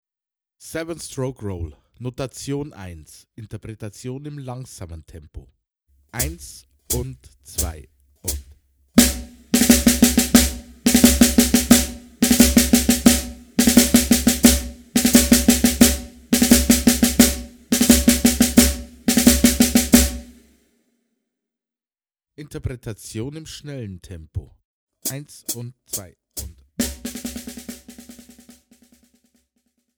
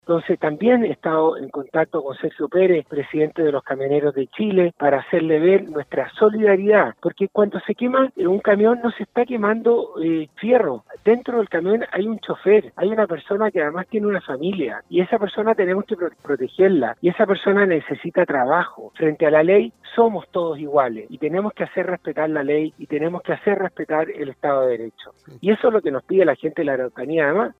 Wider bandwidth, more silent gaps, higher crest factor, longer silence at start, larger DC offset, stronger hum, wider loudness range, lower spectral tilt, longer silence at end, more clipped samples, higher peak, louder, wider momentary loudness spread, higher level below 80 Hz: first, over 20 kHz vs 4.2 kHz; first, 24.65-24.87 s vs none; about the same, 20 dB vs 16 dB; first, 0.65 s vs 0.05 s; neither; neither; first, 19 LU vs 4 LU; second, -3.5 dB/octave vs -8.5 dB/octave; first, 2.05 s vs 0.1 s; neither; first, 0 dBFS vs -4 dBFS; first, -17 LUFS vs -20 LUFS; first, 21 LU vs 8 LU; first, -32 dBFS vs -66 dBFS